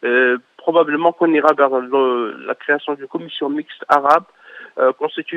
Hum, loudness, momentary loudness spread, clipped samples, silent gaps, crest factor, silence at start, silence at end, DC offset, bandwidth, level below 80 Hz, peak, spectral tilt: none; -17 LUFS; 11 LU; under 0.1%; none; 18 dB; 0.05 s; 0 s; under 0.1%; 9.2 kHz; -70 dBFS; 0 dBFS; -5.5 dB/octave